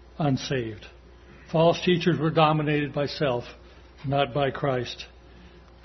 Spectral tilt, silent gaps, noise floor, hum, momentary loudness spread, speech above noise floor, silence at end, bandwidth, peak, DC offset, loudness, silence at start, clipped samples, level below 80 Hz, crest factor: -6.5 dB/octave; none; -49 dBFS; none; 16 LU; 25 dB; 0.25 s; 6.4 kHz; -6 dBFS; under 0.1%; -25 LUFS; 0.05 s; under 0.1%; -52 dBFS; 20 dB